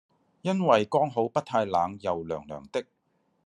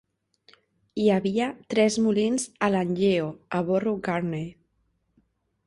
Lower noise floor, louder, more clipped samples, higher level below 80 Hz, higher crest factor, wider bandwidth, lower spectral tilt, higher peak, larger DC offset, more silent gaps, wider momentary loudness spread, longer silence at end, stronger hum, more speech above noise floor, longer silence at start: about the same, -72 dBFS vs -72 dBFS; about the same, -27 LUFS vs -25 LUFS; neither; about the same, -68 dBFS vs -64 dBFS; about the same, 22 dB vs 18 dB; about the same, 10.5 kHz vs 11.5 kHz; about the same, -6.5 dB/octave vs -5.5 dB/octave; about the same, -6 dBFS vs -8 dBFS; neither; neither; first, 12 LU vs 8 LU; second, 0.65 s vs 1.15 s; neither; about the same, 45 dB vs 47 dB; second, 0.45 s vs 0.95 s